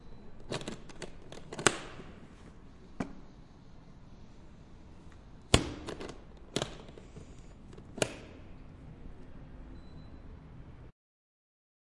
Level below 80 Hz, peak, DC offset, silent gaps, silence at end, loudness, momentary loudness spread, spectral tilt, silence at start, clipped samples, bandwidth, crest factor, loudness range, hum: -50 dBFS; -2 dBFS; under 0.1%; none; 1 s; -36 LUFS; 25 LU; -3.5 dB/octave; 0 s; under 0.1%; 11.5 kHz; 38 dB; 13 LU; none